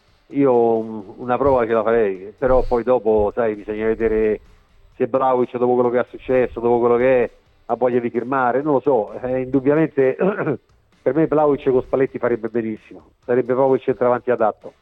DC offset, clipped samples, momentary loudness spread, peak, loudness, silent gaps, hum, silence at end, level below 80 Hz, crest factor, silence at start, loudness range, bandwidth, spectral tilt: under 0.1%; under 0.1%; 8 LU; -4 dBFS; -19 LUFS; none; none; 0.1 s; -40 dBFS; 14 dB; 0.3 s; 2 LU; 4.8 kHz; -10 dB/octave